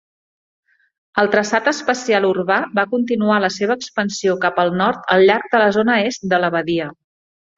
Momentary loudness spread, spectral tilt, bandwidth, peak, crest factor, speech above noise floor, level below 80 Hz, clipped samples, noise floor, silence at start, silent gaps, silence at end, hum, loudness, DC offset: 7 LU; -4.5 dB/octave; 7.8 kHz; -2 dBFS; 16 dB; over 73 dB; -60 dBFS; under 0.1%; under -90 dBFS; 1.15 s; none; 0.65 s; none; -17 LUFS; under 0.1%